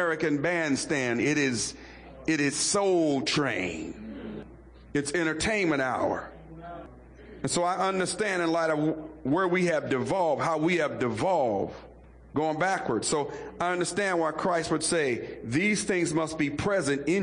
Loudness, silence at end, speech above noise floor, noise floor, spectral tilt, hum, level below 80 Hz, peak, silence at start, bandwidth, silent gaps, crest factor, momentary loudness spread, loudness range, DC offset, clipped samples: -27 LUFS; 0 s; 22 dB; -49 dBFS; -4 dB/octave; none; -56 dBFS; -16 dBFS; 0 s; 10.5 kHz; none; 12 dB; 11 LU; 3 LU; under 0.1%; under 0.1%